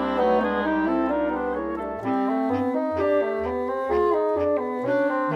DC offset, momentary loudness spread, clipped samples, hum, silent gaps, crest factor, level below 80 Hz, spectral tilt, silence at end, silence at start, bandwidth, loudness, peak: under 0.1%; 5 LU; under 0.1%; none; none; 12 dB; -50 dBFS; -7.5 dB/octave; 0 s; 0 s; 7.4 kHz; -24 LUFS; -10 dBFS